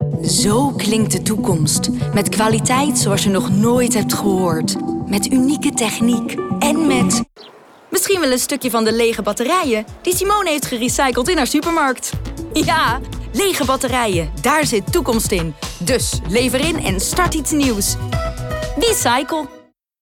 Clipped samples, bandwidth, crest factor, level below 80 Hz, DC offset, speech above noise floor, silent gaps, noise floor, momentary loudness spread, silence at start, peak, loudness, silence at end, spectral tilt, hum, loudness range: under 0.1%; 18 kHz; 12 dB; -34 dBFS; under 0.1%; 26 dB; none; -43 dBFS; 7 LU; 0 s; -6 dBFS; -17 LUFS; 0.4 s; -4 dB/octave; none; 2 LU